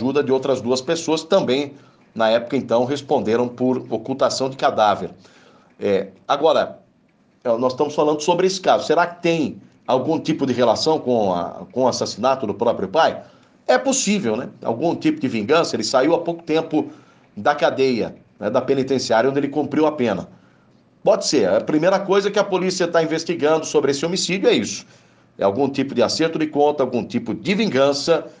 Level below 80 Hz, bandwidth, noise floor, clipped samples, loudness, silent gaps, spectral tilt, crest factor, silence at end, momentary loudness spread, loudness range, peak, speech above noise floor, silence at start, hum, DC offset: -64 dBFS; 10 kHz; -58 dBFS; under 0.1%; -20 LUFS; none; -4.5 dB/octave; 16 dB; 0.1 s; 7 LU; 2 LU; -4 dBFS; 39 dB; 0 s; none; under 0.1%